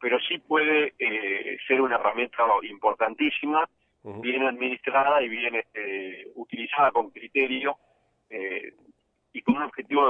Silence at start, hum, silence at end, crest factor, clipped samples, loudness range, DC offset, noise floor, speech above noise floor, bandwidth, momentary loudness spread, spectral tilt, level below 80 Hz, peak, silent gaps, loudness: 0 s; none; 0 s; 18 dB; under 0.1%; 4 LU; under 0.1%; -62 dBFS; 37 dB; 4 kHz; 13 LU; -6.5 dB/octave; -70 dBFS; -8 dBFS; none; -25 LUFS